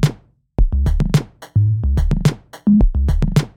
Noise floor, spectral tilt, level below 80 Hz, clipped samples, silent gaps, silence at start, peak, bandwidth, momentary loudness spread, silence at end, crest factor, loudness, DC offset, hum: -36 dBFS; -7.5 dB/octave; -18 dBFS; under 0.1%; none; 0 s; 0 dBFS; 14.5 kHz; 7 LU; 0.1 s; 14 dB; -18 LUFS; under 0.1%; none